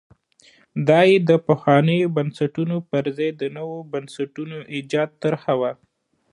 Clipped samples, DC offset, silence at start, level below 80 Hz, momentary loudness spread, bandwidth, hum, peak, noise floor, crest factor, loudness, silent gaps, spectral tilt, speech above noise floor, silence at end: under 0.1%; under 0.1%; 0.75 s; -68 dBFS; 15 LU; 11 kHz; none; -2 dBFS; -55 dBFS; 20 dB; -21 LUFS; none; -7.5 dB/octave; 35 dB; 0.6 s